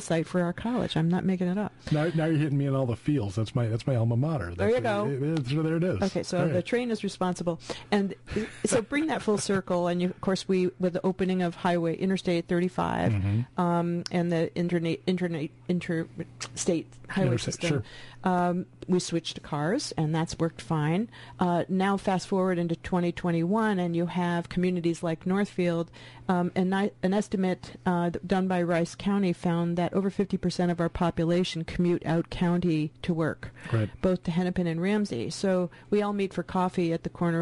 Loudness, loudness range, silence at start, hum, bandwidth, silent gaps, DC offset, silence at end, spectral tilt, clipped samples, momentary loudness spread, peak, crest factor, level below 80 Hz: -28 LUFS; 2 LU; 0 s; none; 11.5 kHz; none; under 0.1%; 0 s; -6.5 dB/octave; under 0.1%; 5 LU; -12 dBFS; 16 dB; -52 dBFS